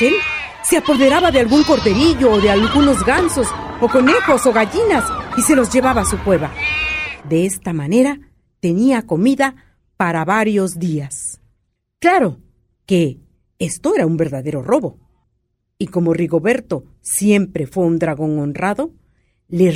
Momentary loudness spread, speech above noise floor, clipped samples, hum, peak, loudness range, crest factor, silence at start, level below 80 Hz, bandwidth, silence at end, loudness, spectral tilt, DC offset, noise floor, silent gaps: 10 LU; 53 dB; under 0.1%; none; 0 dBFS; 6 LU; 16 dB; 0 s; -38 dBFS; 16 kHz; 0 s; -16 LUFS; -5 dB/octave; under 0.1%; -68 dBFS; none